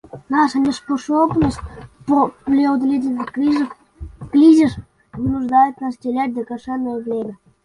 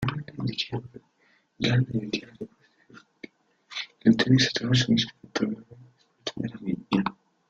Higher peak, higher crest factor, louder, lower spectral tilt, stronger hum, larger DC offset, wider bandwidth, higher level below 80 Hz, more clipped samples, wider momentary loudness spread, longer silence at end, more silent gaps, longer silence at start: first, -2 dBFS vs -8 dBFS; about the same, 16 dB vs 20 dB; first, -18 LUFS vs -26 LUFS; about the same, -6.5 dB/octave vs -5.5 dB/octave; neither; neither; first, 11 kHz vs 7.8 kHz; first, -42 dBFS vs -58 dBFS; neither; second, 17 LU vs 21 LU; about the same, 0.3 s vs 0.4 s; neither; first, 0.15 s vs 0 s